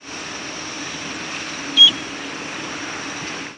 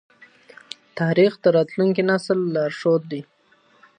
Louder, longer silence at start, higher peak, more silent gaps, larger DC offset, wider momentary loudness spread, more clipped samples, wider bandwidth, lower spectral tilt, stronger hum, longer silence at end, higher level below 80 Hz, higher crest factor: about the same, -18 LUFS vs -20 LUFS; second, 0 s vs 0.95 s; first, -2 dBFS vs -6 dBFS; neither; neither; about the same, 18 LU vs 17 LU; neither; first, 11 kHz vs 9.8 kHz; second, -1 dB/octave vs -7 dB/octave; neither; second, 0 s vs 0.75 s; first, -58 dBFS vs -72 dBFS; about the same, 20 dB vs 16 dB